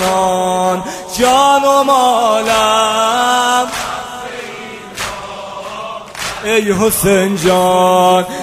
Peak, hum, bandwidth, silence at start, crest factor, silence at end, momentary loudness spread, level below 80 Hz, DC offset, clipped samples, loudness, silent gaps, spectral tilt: 0 dBFS; none; 16 kHz; 0 s; 14 dB; 0 s; 16 LU; -42 dBFS; under 0.1%; under 0.1%; -12 LUFS; none; -3.5 dB/octave